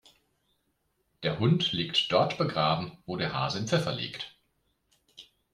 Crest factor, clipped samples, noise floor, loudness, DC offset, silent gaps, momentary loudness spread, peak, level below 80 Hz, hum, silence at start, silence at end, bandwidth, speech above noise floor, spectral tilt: 20 dB; under 0.1%; -75 dBFS; -28 LUFS; under 0.1%; none; 11 LU; -10 dBFS; -64 dBFS; none; 1.2 s; 0.3 s; 12 kHz; 47 dB; -5.5 dB/octave